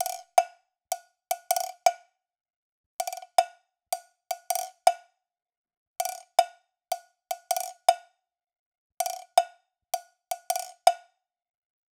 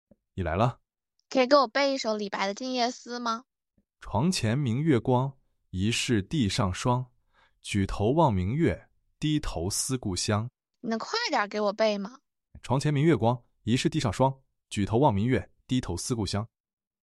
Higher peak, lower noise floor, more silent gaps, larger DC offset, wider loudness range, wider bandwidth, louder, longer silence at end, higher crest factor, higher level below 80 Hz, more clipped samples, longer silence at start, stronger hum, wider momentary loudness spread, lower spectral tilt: first, -4 dBFS vs -8 dBFS; second, -65 dBFS vs -74 dBFS; first, 2.56-2.99 s, 5.57-5.64 s, 5.77-5.94 s, 8.59-8.72 s, 8.78-8.90 s vs none; neither; about the same, 1 LU vs 2 LU; first, over 20 kHz vs 13 kHz; about the same, -29 LUFS vs -27 LUFS; first, 1 s vs 0.55 s; first, 26 dB vs 20 dB; second, -90 dBFS vs -48 dBFS; neither; second, 0 s vs 0.35 s; neither; about the same, 13 LU vs 11 LU; second, 3.5 dB/octave vs -5.5 dB/octave